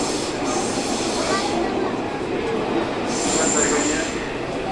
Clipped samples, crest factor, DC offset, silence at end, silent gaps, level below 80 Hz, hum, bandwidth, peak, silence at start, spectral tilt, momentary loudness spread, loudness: under 0.1%; 16 dB; under 0.1%; 0 s; none; -44 dBFS; none; 11.5 kHz; -6 dBFS; 0 s; -3 dB/octave; 7 LU; -22 LUFS